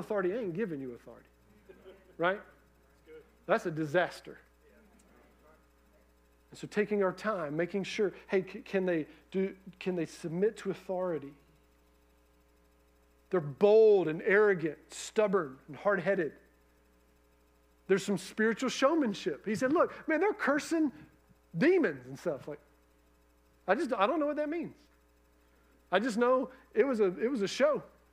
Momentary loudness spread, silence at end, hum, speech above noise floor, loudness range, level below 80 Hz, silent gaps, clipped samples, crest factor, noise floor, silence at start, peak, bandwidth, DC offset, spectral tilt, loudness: 12 LU; 0.25 s; none; 35 dB; 9 LU; -68 dBFS; none; under 0.1%; 20 dB; -66 dBFS; 0 s; -12 dBFS; 15 kHz; under 0.1%; -5.5 dB/octave; -31 LUFS